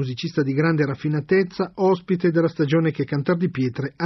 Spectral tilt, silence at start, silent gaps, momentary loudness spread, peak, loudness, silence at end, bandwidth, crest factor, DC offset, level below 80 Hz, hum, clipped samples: -8.5 dB/octave; 0 s; none; 5 LU; -6 dBFS; -22 LUFS; 0 s; 6.2 kHz; 14 dB; under 0.1%; -60 dBFS; none; under 0.1%